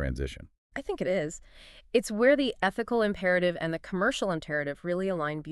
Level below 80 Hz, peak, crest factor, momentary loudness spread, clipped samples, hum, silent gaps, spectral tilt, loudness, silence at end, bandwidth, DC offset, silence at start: -46 dBFS; -12 dBFS; 18 dB; 13 LU; under 0.1%; none; 0.58-0.70 s; -5 dB/octave; -29 LUFS; 0 s; 13 kHz; under 0.1%; 0 s